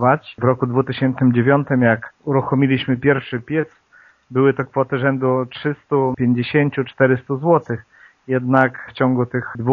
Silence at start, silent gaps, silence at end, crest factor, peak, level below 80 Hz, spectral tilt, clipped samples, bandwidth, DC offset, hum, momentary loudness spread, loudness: 0 s; none; 0 s; 18 dB; 0 dBFS; -58 dBFS; -6.5 dB/octave; under 0.1%; 4.9 kHz; under 0.1%; none; 7 LU; -18 LUFS